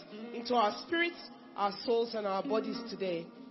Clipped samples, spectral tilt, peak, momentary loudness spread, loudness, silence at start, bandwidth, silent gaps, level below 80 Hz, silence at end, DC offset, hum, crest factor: under 0.1%; -2 dB/octave; -16 dBFS; 11 LU; -34 LUFS; 0 s; 6 kHz; none; -78 dBFS; 0 s; under 0.1%; none; 18 dB